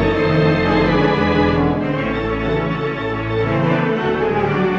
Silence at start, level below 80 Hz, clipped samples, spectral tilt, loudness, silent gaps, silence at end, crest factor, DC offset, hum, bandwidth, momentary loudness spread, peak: 0 s; -34 dBFS; under 0.1%; -8 dB/octave; -17 LUFS; none; 0 s; 14 dB; under 0.1%; none; 7.4 kHz; 6 LU; -2 dBFS